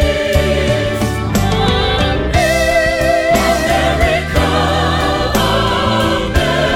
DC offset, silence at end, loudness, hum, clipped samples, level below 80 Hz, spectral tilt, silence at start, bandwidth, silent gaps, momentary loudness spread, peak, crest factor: under 0.1%; 0 s; -14 LUFS; none; under 0.1%; -22 dBFS; -5 dB/octave; 0 s; 17.5 kHz; none; 3 LU; 0 dBFS; 12 dB